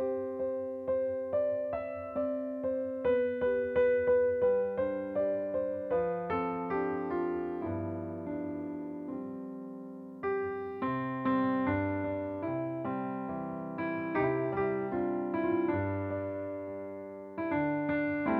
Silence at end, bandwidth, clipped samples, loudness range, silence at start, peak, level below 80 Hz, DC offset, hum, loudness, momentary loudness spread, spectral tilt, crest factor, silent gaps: 0 s; 4.5 kHz; under 0.1%; 7 LU; 0 s; -18 dBFS; -62 dBFS; under 0.1%; none; -33 LUFS; 10 LU; -10 dB/octave; 16 dB; none